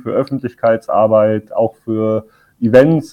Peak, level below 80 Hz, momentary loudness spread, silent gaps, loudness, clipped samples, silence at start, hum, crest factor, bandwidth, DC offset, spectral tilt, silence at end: 0 dBFS; -54 dBFS; 10 LU; none; -15 LUFS; under 0.1%; 0.05 s; none; 14 dB; 10 kHz; under 0.1%; -8.5 dB/octave; 0.05 s